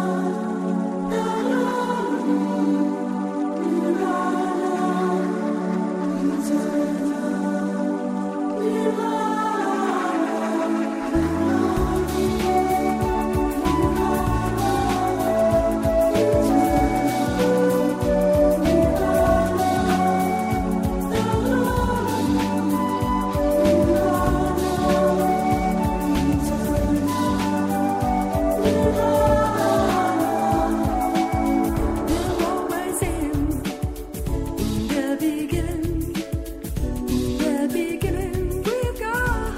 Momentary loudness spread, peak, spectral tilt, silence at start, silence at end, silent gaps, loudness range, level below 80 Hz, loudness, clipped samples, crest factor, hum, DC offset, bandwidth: 6 LU; -6 dBFS; -6.5 dB/octave; 0 s; 0 s; none; 5 LU; -34 dBFS; -22 LUFS; under 0.1%; 14 dB; none; under 0.1%; 16 kHz